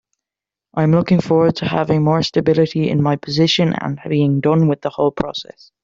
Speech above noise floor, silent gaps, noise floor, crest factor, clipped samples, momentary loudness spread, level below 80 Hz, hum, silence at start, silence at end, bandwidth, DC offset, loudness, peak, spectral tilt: 72 dB; none; -88 dBFS; 14 dB; under 0.1%; 6 LU; -50 dBFS; none; 0.75 s; 0.4 s; 7.6 kHz; under 0.1%; -16 LUFS; -2 dBFS; -7 dB/octave